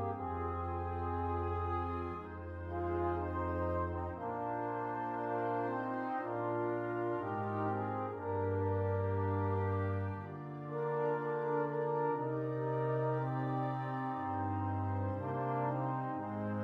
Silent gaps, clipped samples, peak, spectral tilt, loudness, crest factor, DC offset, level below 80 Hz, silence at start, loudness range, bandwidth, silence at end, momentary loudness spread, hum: none; under 0.1%; -24 dBFS; -10.5 dB/octave; -37 LUFS; 12 dB; under 0.1%; -56 dBFS; 0 s; 2 LU; 4.9 kHz; 0 s; 5 LU; none